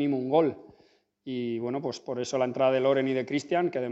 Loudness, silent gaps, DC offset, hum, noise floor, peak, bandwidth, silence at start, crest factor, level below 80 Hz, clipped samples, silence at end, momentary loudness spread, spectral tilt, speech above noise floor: -28 LUFS; none; under 0.1%; none; -63 dBFS; -10 dBFS; 8.2 kHz; 0 s; 18 dB; -76 dBFS; under 0.1%; 0 s; 9 LU; -6 dB/octave; 36 dB